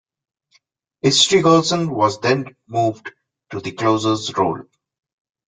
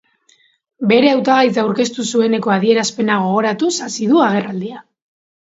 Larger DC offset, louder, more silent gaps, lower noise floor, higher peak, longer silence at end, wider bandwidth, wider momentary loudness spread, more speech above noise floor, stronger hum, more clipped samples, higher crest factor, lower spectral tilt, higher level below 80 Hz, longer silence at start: neither; about the same, -17 LUFS vs -15 LUFS; neither; first, -62 dBFS vs -56 dBFS; about the same, -2 dBFS vs 0 dBFS; first, 0.85 s vs 0.65 s; first, 9.6 kHz vs 8 kHz; first, 17 LU vs 7 LU; about the same, 44 dB vs 41 dB; neither; neither; about the same, 18 dB vs 16 dB; about the same, -4 dB/octave vs -4.5 dB/octave; first, -58 dBFS vs -64 dBFS; first, 1.05 s vs 0.8 s